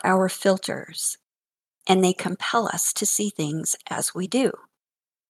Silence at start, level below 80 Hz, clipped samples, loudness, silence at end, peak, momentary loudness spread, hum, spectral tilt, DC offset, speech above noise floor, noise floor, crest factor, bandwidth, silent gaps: 0.05 s; -74 dBFS; under 0.1%; -23 LUFS; 0.75 s; -4 dBFS; 7 LU; none; -3.5 dB/octave; under 0.1%; over 66 dB; under -90 dBFS; 22 dB; 16 kHz; none